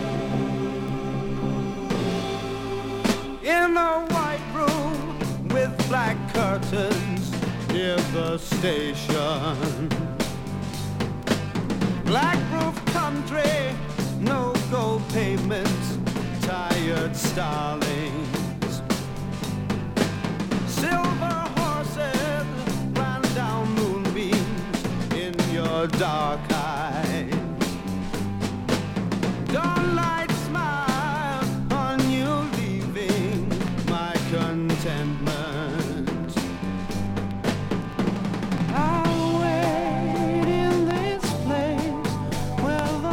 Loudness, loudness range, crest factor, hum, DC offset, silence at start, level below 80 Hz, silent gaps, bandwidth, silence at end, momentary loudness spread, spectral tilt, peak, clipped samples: -25 LUFS; 3 LU; 18 dB; none; under 0.1%; 0 s; -42 dBFS; none; 19 kHz; 0 s; 6 LU; -5.5 dB/octave; -6 dBFS; under 0.1%